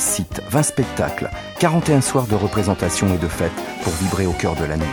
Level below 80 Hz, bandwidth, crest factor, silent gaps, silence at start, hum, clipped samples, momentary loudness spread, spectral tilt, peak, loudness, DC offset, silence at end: -36 dBFS; over 20 kHz; 18 dB; none; 0 s; none; under 0.1%; 7 LU; -5 dB/octave; -2 dBFS; -20 LUFS; under 0.1%; 0 s